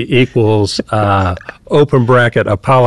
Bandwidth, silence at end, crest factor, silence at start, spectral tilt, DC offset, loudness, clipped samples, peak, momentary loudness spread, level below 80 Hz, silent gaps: 11.5 kHz; 0 s; 10 dB; 0 s; -6.5 dB/octave; 1%; -12 LUFS; under 0.1%; -2 dBFS; 5 LU; -32 dBFS; none